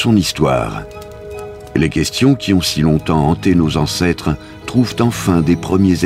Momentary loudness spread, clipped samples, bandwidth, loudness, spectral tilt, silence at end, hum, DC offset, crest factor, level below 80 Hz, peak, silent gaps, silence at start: 15 LU; under 0.1%; 16 kHz; -15 LUFS; -5.5 dB/octave; 0 s; none; under 0.1%; 14 dB; -34 dBFS; 0 dBFS; none; 0 s